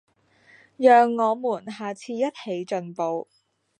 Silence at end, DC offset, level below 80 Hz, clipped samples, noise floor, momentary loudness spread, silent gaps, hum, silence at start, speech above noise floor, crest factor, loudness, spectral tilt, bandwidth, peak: 0.6 s; under 0.1%; -82 dBFS; under 0.1%; -57 dBFS; 16 LU; none; none; 0.8 s; 35 dB; 20 dB; -23 LUFS; -5.5 dB/octave; 9.6 kHz; -4 dBFS